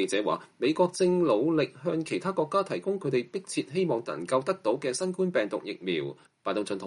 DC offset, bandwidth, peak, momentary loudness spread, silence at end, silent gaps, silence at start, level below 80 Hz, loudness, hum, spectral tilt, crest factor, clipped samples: under 0.1%; 11.5 kHz; -12 dBFS; 8 LU; 0 s; none; 0 s; -76 dBFS; -29 LUFS; none; -5.5 dB/octave; 16 dB; under 0.1%